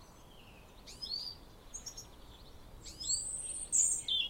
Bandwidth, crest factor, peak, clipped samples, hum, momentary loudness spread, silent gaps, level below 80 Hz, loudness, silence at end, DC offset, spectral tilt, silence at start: 16 kHz; 22 dB; -16 dBFS; under 0.1%; none; 27 LU; none; -58 dBFS; -34 LUFS; 0 s; under 0.1%; 1 dB/octave; 0 s